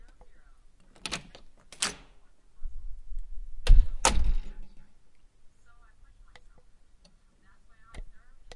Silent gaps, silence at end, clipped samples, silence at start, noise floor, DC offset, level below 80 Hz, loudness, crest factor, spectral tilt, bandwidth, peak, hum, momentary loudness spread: none; 0 s; under 0.1%; 1.05 s; -59 dBFS; under 0.1%; -30 dBFS; -30 LUFS; 24 dB; -2.5 dB/octave; 11.5 kHz; -4 dBFS; none; 26 LU